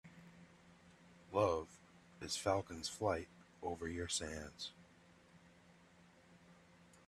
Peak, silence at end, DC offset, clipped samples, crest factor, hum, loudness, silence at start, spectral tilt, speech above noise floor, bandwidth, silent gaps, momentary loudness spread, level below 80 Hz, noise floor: -20 dBFS; 0.1 s; under 0.1%; under 0.1%; 24 dB; none; -41 LUFS; 0.05 s; -3.5 dB/octave; 26 dB; 13 kHz; none; 25 LU; -70 dBFS; -66 dBFS